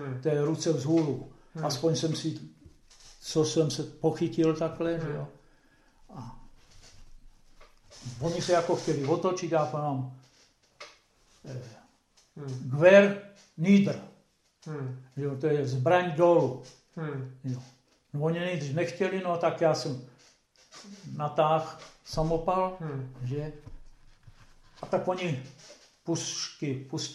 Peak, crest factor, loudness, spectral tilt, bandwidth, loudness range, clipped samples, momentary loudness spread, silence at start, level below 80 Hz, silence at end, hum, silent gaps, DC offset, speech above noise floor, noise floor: -6 dBFS; 24 dB; -28 LUFS; -6 dB/octave; 12.5 kHz; 10 LU; under 0.1%; 21 LU; 0 s; -56 dBFS; 0 s; none; none; under 0.1%; 37 dB; -65 dBFS